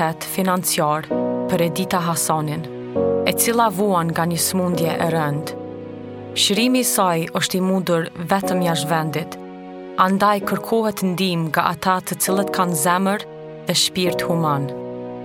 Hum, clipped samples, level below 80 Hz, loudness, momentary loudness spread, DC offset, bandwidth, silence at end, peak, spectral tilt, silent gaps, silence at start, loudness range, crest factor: none; under 0.1%; -60 dBFS; -19 LUFS; 12 LU; under 0.1%; 17 kHz; 0 s; 0 dBFS; -4 dB/octave; none; 0 s; 1 LU; 20 dB